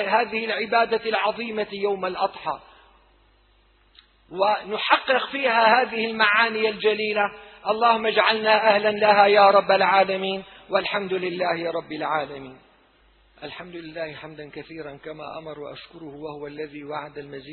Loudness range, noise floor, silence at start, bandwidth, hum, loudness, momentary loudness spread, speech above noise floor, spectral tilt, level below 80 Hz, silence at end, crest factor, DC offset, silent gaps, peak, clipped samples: 18 LU; -59 dBFS; 0 s; 4.5 kHz; none; -21 LUFS; 20 LU; 37 dB; -7 dB/octave; -64 dBFS; 0 s; 20 dB; under 0.1%; none; -2 dBFS; under 0.1%